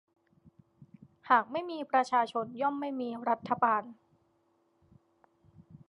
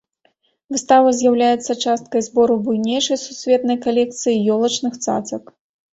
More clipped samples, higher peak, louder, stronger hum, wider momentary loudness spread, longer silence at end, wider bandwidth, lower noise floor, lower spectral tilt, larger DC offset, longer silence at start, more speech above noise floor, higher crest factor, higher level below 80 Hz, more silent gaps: neither; second, -10 dBFS vs -2 dBFS; second, -31 LUFS vs -18 LUFS; neither; about the same, 9 LU vs 9 LU; second, 0.1 s vs 0.55 s; first, 11 kHz vs 8 kHz; first, -72 dBFS vs -63 dBFS; about the same, -5 dB/octave vs -4 dB/octave; neither; first, 1.25 s vs 0.7 s; second, 42 dB vs 46 dB; first, 24 dB vs 16 dB; second, -78 dBFS vs -62 dBFS; neither